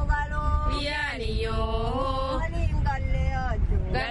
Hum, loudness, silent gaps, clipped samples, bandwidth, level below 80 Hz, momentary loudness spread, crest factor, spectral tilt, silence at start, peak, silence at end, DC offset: none; -28 LUFS; none; under 0.1%; 11.5 kHz; -28 dBFS; 1 LU; 14 dB; -6.5 dB/octave; 0 s; -12 dBFS; 0 s; under 0.1%